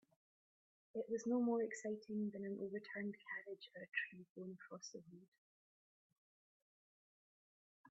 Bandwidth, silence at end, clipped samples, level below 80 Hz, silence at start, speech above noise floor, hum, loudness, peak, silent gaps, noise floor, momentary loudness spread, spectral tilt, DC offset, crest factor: 7.6 kHz; 0 s; under 0.1%; under -90 dBFS; 0.95 s; over 45 dB; none; -46 LUFS; -28 dBFS; 4.30-4.35 s, 5.28-5.32 s, 5.38-6.10 s, 6.18-7.84 s; under -90 dBFS; 15 LU; -5 dB/octave; under 0.1%; 20 dB